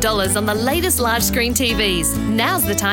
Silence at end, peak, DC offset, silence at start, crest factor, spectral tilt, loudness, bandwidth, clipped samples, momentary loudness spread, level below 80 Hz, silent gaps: 0 s; -2 dBFS; under 0.1%; 0 s; 16 dB; -3 dB/octave; -17 LUFS; 17 kHz; under 0.1%; 2 LU; -32 dBFS; none